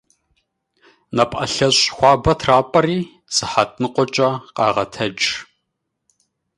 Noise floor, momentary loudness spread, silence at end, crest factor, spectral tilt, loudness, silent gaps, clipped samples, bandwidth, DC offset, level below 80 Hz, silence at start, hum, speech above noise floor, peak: -76 dBFS; 7 LU; 1.15 s; 18 dB; -3.5 dB/octave; -17 LUFS; none; under 0.1%; 11.5 kHz; under 0.1%; -42 dBFS; 1.1 s; none; 58 dB; 0 dBFS